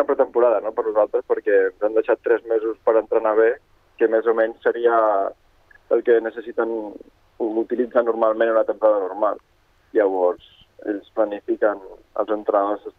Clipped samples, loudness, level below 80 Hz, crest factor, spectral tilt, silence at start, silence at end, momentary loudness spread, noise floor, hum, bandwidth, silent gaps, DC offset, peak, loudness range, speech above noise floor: under 0.1%; -21 LUFS; -62 dBFS; 16 dB; -7 dB/octave; 0 s; 0.1 s; 10 LU; -50 dBFS; none; 3.9 kHz; none; under 0.1%; -4 dBFS; 3 LU; 30 dB